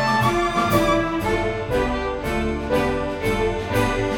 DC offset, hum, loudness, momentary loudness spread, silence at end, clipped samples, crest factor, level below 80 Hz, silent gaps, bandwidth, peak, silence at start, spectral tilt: under 0.1%; none; -21 LUFS; 5 LU; 0 s; under 0.1%; 16 dB; -34 dBFS; none; 18 kHz; -4 dBFS; 0 s; -5.5 dB/octave